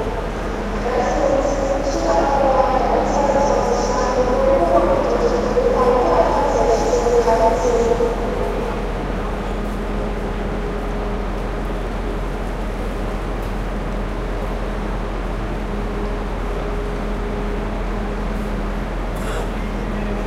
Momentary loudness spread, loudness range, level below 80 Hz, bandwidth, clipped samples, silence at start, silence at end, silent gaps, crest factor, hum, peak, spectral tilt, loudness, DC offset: 10 LU; 9 LU; -26 dBFS; 12.5 kHz; under 0.1%; 0 s; 0 s; none; 18 dB; none; -2 dBFS; -6 dB/octave; -20 LUFS; under 0.1%